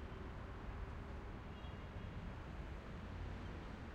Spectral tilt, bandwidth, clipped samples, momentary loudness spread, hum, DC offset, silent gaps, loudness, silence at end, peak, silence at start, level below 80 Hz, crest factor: -7 dB/octave; 9.8 kHz; under 0.1%; 2 LU; none; under 0.1%; none; -51 LUFS; 0 s; -36 dBFS; 0 s; -52 dBFS; 12 dB